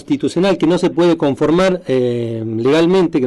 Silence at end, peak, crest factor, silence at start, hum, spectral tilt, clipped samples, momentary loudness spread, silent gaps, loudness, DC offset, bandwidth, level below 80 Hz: 0 s; -4 dBFS; 10 dB; 0.1 s; none; -6.5 dB/octave; under 0.1%; 6 LU; none; -15 LUFS; under 0.1%; 11.5 kHz; -46 dBFS